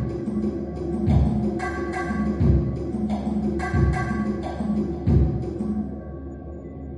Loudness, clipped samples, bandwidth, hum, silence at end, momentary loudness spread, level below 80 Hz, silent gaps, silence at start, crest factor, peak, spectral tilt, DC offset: -24 LUFS; under 0.1%; 10.5 kHz; none; 0 s; 13 LU; -32 dBFS; none; 0 s; 16 dB; -8 dBFS; -9 dB/octave; under 0.1%